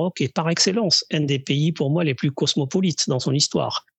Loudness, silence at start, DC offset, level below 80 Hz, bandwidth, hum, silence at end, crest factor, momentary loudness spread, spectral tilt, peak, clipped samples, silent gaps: -21 LUFS; 0 s; under 0.1%; -68 dBFS; 8.6 kHz; none; 0.2 s; 18 dB; 4 LU; -4.5 dB/octave; -4 dBFS; under 0.1%; none